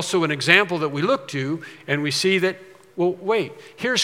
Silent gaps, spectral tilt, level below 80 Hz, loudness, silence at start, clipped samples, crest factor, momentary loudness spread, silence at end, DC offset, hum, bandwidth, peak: none; -4 dB/octave; -76 dBFS; -21 LUFS; 0 s; under 0.1%; 22 dB; 14 LU; 0 s; under 0.1%; none; 16 kHz; 0 dBFS